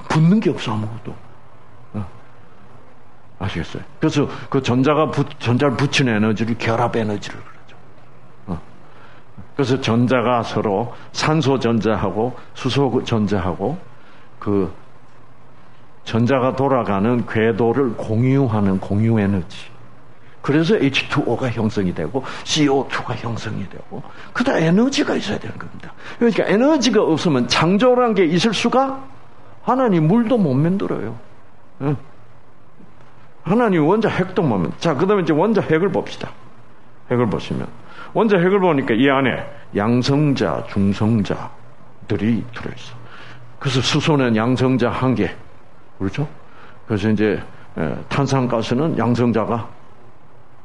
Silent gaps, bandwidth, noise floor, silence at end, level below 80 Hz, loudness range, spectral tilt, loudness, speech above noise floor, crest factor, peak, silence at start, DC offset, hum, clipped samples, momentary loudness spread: none; 11 kHz; -49 dBFS; 0.95 s; -50 dBFS; 6 LU; -6.5 dB/octave; -19 LUFS; 31 dB; 16 dB; -2 dBFS; 0 s; 2%; none; under 0.1%; 16 LU